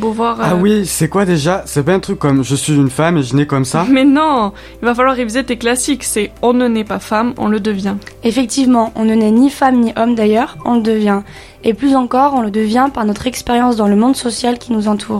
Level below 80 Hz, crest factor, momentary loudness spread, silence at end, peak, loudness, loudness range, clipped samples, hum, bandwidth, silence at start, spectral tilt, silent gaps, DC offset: -40 dBFS; 12 dB; 6 LU; 0 s; 0 dBFS; -14 LUFS; 2 LU; under 0.1%; none; 15.5 kHz; 0 s; -5.5 dB/octave; none; under 0.1%